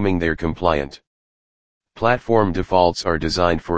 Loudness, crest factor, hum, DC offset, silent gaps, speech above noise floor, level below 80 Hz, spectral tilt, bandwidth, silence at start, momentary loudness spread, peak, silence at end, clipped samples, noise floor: -19 LUFS; 20 dB; none; 2%; 1.07-1.81 s; over 71 dB; -38 dBFS; -6 dB/octave; 9.6 kHz; 0 s; 5 LU; 0 dBFS; 0 s; under 0.1%; under -90 dBFS